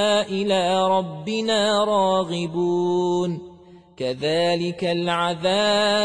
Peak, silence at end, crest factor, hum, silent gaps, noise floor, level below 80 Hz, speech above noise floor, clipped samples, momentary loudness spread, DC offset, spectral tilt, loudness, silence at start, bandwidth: -8 dBFS; 0 s; 14 dB; none; none; -47 dBFS; -62 dBFS; 26 dB; under 0.1%; 6 LU; 0.1%; -4.5 dB/octave; -21 LUFS; 0 s; 10.5 kHz